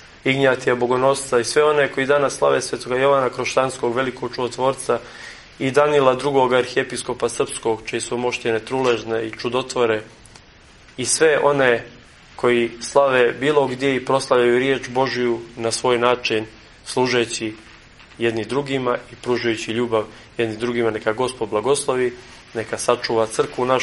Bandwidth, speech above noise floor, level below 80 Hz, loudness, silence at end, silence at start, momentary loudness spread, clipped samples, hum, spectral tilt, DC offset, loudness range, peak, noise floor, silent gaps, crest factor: 11.5 kHz; 28 dB; -54 dBFS; -20 LUFS; 0 s; 0 s; 9 LU; under 0.1%; none; -4 dB/octave; under 0.1%; 4 LU; 0 dBFS; -47 dBFS; none; 20 dB